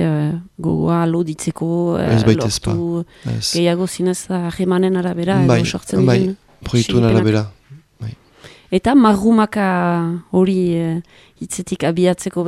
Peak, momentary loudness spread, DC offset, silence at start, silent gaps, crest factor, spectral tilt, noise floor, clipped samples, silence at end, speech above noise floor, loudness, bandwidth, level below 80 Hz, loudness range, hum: 0 dBFS; 10 LU; under 0.1%; 0 s; none; 16 dB; -6 dB/octave; -44 dBFS; under 0.1%; 0 s; 28 dB; -17 LUFS; 13.5 kHz; -42 dBFS; 2 LU; none